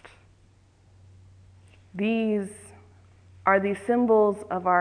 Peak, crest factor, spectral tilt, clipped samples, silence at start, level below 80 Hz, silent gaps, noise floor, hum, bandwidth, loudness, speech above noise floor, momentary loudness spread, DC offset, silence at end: -6 dBFS; 20 dB; -6.5 dB/octave; under 0.1%; 0.05 s; -64 dBFS; none; -58 dBFS; none; 10.5 kHz; -24 LUFS; 35 dB; 15 LU; under 0.1%; 0 s